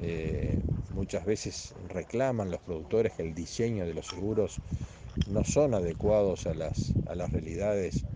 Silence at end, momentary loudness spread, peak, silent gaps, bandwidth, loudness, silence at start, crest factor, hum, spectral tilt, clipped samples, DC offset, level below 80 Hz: 0 s; 11 LU; -14 dBFS; none; 10 kHz; -32 LUFS; 0 s; 18 dB; none; -6.5 dB/octave; under 0.1%; under 0.1%; -44 dBFS